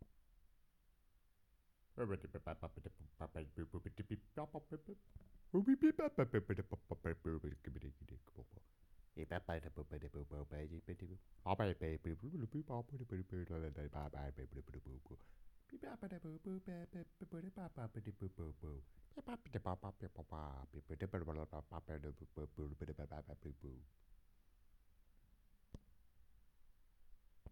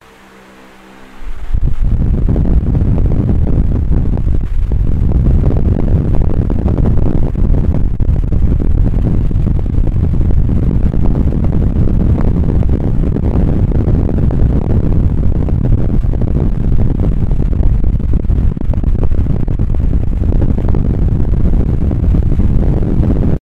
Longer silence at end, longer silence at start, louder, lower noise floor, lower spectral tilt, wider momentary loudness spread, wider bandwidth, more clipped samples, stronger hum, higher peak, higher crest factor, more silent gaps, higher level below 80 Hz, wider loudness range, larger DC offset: about the same, 0 s vs 0 s; about the same, 0 s vs 0 s; second, -47 LUFS vs -15 LUFS; first, -75 dBFS vs -39 dBFS; second, -9 dB/octave vs -11 dB/octave; first, 18 LU vs 3 LU; first, 18 kHz vs 3.7 kHz; second, under 0.1% vs 0.1%; neither; second, -22 dBFS vs 0 dBFS; first, 24 dB vs 10 dB; neither; second, -60 dBFS vs -14 dBFS; first, 12 LU vs 2 LU; neither